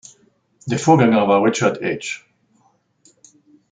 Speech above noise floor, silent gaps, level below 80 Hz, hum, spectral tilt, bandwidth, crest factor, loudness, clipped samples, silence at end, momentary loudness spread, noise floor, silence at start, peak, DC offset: 44 dB; none; -62 dBFS; none; -5.5 dB/octave; 9.4 kHz; 18 dB; -17 LUFS; under 0.1%; 1.55 s; 16 LU; -61 dBFS; 0.65 s; -2 dBFS; under 0.1%